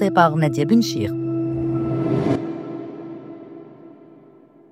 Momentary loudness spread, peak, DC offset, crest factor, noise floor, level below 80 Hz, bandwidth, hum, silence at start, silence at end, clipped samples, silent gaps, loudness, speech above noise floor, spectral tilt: 20 LU; 0 dBFS; under 0.1%; 22 dB; -49 dBFS; -52 dBFS; 15.5 kHz; none; 0 s; 0.65 s; under 0.1%; none; -21 LUFS; 31 dB; -7 dB/octave